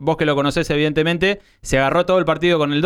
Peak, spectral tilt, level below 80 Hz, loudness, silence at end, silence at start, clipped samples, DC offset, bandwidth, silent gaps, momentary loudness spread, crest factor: -6 dBFS; -5.5 dB/octave; -38 dBFS; -18 LUFS; 0 s; 0 s; under 0.1%; under 0.1%; 14 kHz; none; 3 LU; 12 dB